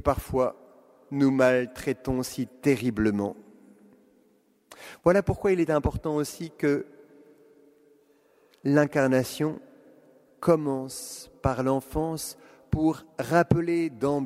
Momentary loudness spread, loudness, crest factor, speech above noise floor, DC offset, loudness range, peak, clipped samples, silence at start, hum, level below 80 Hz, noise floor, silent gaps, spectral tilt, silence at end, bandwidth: 12 LU; -26 LUFS; 22 dB; 39 dB; under 0.1%; 3 LU; -6 dBFS; under 0.1%; 0.05 s; none; -46 dBFS; -64 dBFS; none; -6.5 dB/octave; 0 s; 16 kHz